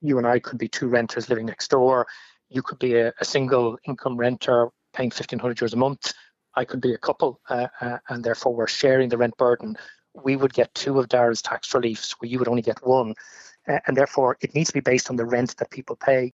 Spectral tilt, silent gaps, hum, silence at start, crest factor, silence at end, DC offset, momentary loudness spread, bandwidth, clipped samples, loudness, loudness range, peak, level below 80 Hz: -5 dB/octave; none; none; 0 s; 16 dB; 0.05 s; under 0.1%; 10 LU; 8 kHz; under 0.1%; -23 LUFS; 3 LU; -6 dBFS; -66 dBFS